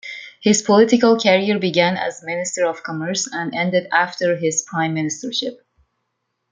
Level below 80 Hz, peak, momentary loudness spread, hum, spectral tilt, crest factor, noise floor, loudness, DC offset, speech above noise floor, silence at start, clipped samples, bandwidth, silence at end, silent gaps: -64 dBFS; -2 dBFS; 10 LU; none; -4 dB/octave; 18 dB; -74 dBFS; -18 LUFS; under 0.1%; 56 dB; 0.05 s; under 0.1%; 9.6 kHz; 1 s; none